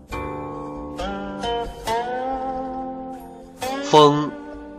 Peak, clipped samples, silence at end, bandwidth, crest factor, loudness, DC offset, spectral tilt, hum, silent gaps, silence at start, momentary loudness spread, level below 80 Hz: -2 dBFS; under 0.1%; 0 s; 14.5 kHz; 20 dB; -23 LUFS; under 0.1%; -5 dB/octave; none; none; 0 s; 19 LU; -44 dBFS